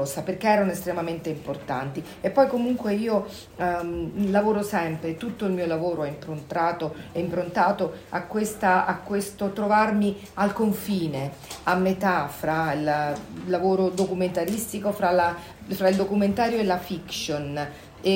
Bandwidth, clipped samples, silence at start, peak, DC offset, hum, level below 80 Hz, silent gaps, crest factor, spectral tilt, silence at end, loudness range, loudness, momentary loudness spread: 16.5 kHz; under 0.1%; 0 s; -6 dBFS; under 0.1%; none; -54 dBFS; none; 18 dB; -5.5 dB/octave; 0 s; 2 LU; -25 LUFS; 10 LU